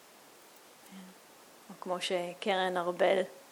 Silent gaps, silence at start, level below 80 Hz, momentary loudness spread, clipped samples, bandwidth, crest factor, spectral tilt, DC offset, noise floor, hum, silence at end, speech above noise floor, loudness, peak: none; 0.85 s; -88 dBFS; 23 LU; under 0.1%; 19.5 kHz; 22 dB; -4 dB/octave; under 0.1%; -57 dBFS; none; 0.1 s; 25 dB; -32 LUFS; -14 dBFS